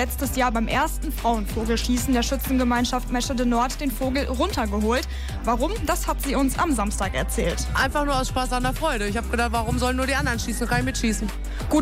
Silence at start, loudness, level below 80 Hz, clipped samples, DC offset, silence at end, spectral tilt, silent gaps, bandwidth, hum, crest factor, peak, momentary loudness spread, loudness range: 0 s; -24 LUFS; -30 dBFS; under 0.1%; under 0.1%; 0 s; -4.5 dB/octave; none; 16 kHz; none; 12 dB; -10 dBFS; 4 LU; 1 LU